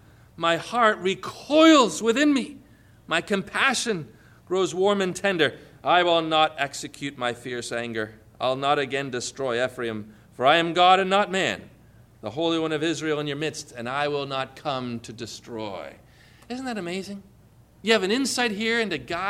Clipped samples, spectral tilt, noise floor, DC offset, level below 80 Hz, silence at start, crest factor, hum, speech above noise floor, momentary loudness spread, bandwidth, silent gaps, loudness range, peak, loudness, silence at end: under 0.1%; -3.5 dB/octave; -54 dBFS; under 0.1%; -60 dBFS; 0.4 s; 18 dB; none; 30 dB; 15 LU; 14.5 kHz; none; 9 LU; -6 dBFS; -24 LUFS; 0 s